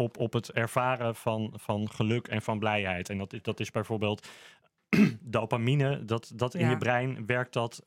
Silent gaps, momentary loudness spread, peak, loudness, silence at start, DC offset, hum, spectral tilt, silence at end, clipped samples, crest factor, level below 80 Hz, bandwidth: none; 8 LU; -10 dBFS; -30 LUFS; 0 s; under 0.1%; none; -6.5 dB/octave; 0.05 s; under 0.1%; 20 dB; -68 dBFS; 16 kHz